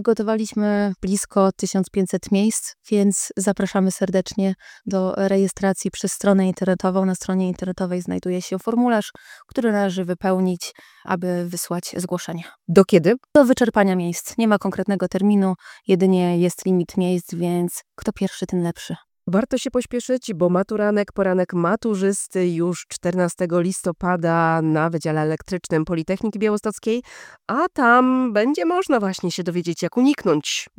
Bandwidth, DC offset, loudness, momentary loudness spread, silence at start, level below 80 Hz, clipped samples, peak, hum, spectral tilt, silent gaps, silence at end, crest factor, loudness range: 17.5 kHz; under 0.1%; -21 LUFS; 9 LU; 0 s; -54 dBFS; under 0.1%; 0 dBFS; none; -5.5 dB/octave; none; 0.15 s; 20 dB; 4 LU